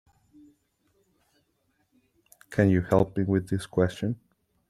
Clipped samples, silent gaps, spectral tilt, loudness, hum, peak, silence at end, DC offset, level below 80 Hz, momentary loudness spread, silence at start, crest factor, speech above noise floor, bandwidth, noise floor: under 0.1%; none; -8 dB/octave; -26 LUFS; none; -6 dBFS; 0.55 s; under 0.1%; -56 dBFS; 10 LU; 2.5 s; 22 dB; 48 dB; 13.5 kHz; -72 dBFS